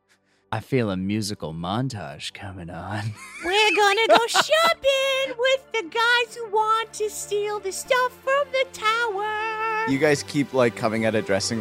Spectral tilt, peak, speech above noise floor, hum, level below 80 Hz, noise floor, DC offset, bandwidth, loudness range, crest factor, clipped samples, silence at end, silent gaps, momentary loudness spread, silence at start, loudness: -3.5 dB/octave; -2 dBFS; 41 dB; none; -60 dBFS; -64 dBFS; under 0.1%; 16 kHz; 5 LU; 22 dB; under 0.1%; 0 s; none; 14 LU; 0.5 s; -22 LUFS